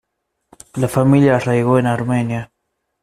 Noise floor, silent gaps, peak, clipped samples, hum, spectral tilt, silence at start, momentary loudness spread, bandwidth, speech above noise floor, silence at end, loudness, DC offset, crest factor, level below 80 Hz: -74 dBFS; none; -2 dBFS; under 0.1%; none; -7.5 dB/octave; 0.75 s; 11 LU; 14.5 kHz; 59 dB; 0.55 s; -16 LUFS; under 0.1%; 16 dB; -50 dBFS